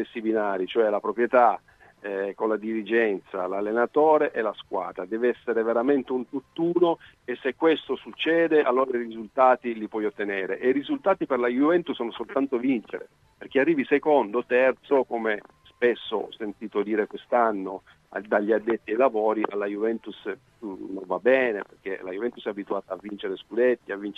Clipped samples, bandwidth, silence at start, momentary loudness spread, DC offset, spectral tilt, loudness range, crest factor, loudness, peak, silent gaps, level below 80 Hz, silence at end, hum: under 0.1%; 5.8 kHz; 0 s; 13 LU; under 0.1%; -7 dB/octave; 3 LU; 20 dB; -25 LUFS; -6 dBFS; none; -70 dBFS; 0.05 s; none